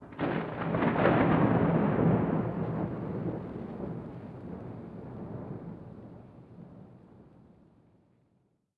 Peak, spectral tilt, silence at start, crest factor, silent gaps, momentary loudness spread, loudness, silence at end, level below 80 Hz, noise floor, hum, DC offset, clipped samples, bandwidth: -12 dBFS; -10.5 dB/octave; 0 s; 20 dB; none; 24 LU; -30 LUFS; 1.55 s; -56 dBFS; -72 dBFS; none; under 0.1%; under 0.1%; 4.7 kHz